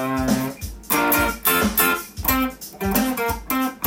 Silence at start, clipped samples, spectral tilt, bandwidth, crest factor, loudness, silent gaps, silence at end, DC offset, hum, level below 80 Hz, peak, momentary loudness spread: 0 s; under 0.1%; -3.5 dB/octave; 17 kHz; 18 dB; -20 LUFS; none; 0 s; under 0.1%; none; -38 dBFS; -2 dBFS; 9 LU